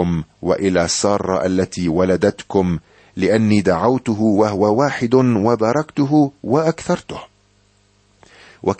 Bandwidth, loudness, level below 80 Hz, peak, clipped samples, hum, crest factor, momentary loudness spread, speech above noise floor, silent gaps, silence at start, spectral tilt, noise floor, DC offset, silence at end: 8.8 kHz; -17 LUFS; -46 dBFS; -2 dBFS; under 0.1%; 50 Hz at -45 dBFS; 16 dB; 7 LU; 40 dB; none; 0 s; -6 dB/octave; -57 dBFS; under 0.1%; 0.05 s